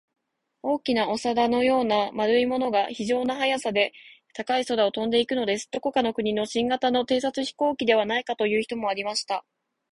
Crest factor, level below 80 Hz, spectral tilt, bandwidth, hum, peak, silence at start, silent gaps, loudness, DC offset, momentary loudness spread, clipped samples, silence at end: 18 dB; -64 dBFS; -4 dB/octave; 11.5 kHz; none; -6 dBFS; 0.65 s; none; -25 LUFS; under 0.1%; 6 LU; under 0.1%; 0.5 s